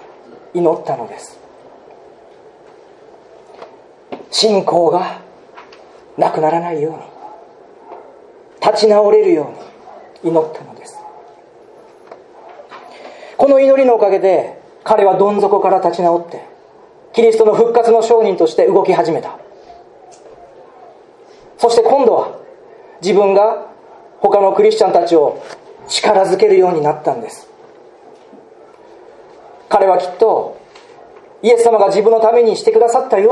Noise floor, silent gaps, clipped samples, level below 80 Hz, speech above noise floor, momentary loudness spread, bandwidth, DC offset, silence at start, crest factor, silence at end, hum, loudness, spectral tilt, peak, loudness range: -43 dBFS; none; under 0.1%; -62 dBFS; 31 dB; 21 LU; 11.5 kHz; under 0.1%; 0.55 s; 14 dB; 0 s; none; -13 LUFS; -5 dB/octave; 0 dBFS; 9 LU